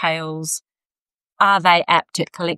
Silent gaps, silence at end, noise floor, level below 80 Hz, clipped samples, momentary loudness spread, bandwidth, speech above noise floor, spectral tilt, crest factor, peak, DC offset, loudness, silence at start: 1.01-1.06 s, 1.14-1.18 s, 1.32-1.36 s; 0 s; under -90 dBFS; -72 dBFS; under 0.1%; 12 LU; 15 kHz; over 72 dB; -3 dB/octave; 18 dB; -2 dBFS; under 0.1%; -18 LUFS; 0 s